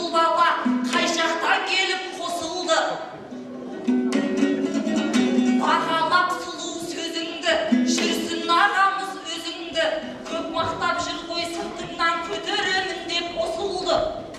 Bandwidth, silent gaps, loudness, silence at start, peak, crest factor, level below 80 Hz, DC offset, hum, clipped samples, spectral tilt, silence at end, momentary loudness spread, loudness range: 13 kHz; none; -23 LUFS; 0 s; -6 dBFS; 18 dB; -56 dBFS; under 0.1%; none; under 0.1%; -3 dB/octave; 0 s; 10 LU; 3 LU